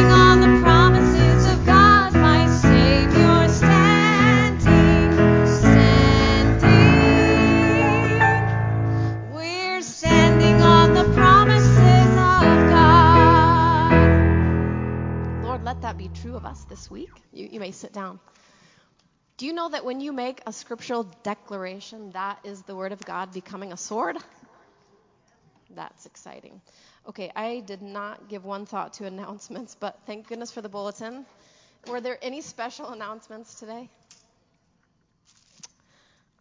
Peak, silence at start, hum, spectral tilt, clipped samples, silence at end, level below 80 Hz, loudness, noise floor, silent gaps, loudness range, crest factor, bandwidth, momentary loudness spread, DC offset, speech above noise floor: 0 dBFS; 0 s; none; -6.5 dB/octave; under 0.1%; 2.55 s; -30 dBFS; -15 LUFS; -68 dBFS; none; 23 LU; 18 dB; 7.6 kHz; 23 LU; under 0.1%; 34 dB